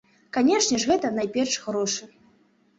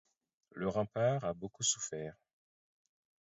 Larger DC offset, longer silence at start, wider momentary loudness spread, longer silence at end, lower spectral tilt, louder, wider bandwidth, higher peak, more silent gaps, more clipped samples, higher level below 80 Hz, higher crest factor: neither; second, 0.35 s vs 0.55 s; second, 8 LU vs 12 LU; second, 0.75 s vs 1.15 s; second, -2.5 dB/octave vs -5 dB/octave; first, -24 LUFS vs -36 LUFS; about the same, 8.2 kHz vs 7.6 kHz; first, -10 dBFS vs -18 dBFS; neither; neither; first, -62 dBFS vs -68 dBFS; about the same, 16 dB vs 20 dB